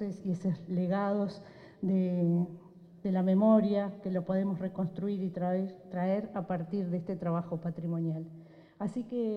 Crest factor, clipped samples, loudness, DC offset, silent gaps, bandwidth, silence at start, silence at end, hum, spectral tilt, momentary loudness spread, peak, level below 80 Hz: 18 dB; under 0.1%; -32 LUFS; under 0.1%; none; 6.2 kHz; 0 s; 0 s; none; -10 dB/octave; 11 LU; -14 dBFS; -72 dBFS